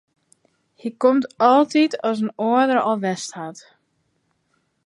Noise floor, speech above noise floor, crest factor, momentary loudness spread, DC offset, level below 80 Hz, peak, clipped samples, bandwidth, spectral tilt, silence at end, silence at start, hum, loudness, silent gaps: -69 dBFS; 50 dB; 20 dB; 17 LU; under 0.1%; -76 dBFS; -2 dBFS; under 0.1%; 11.5 kHz; -5 dB/octave; 1.35 s; 0.85 s; none; -19 LUFS; none